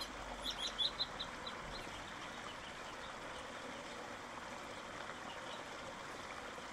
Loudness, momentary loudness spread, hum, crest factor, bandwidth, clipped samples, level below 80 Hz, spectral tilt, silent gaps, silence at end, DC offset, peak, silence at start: -45 LUFS; 10 LU; none; 22 dB; 16 kHz; under 0.1%; -62 dBFS; -2 dB/octave; none; 0 s; under 0.1%; -24 dBFS; 0 s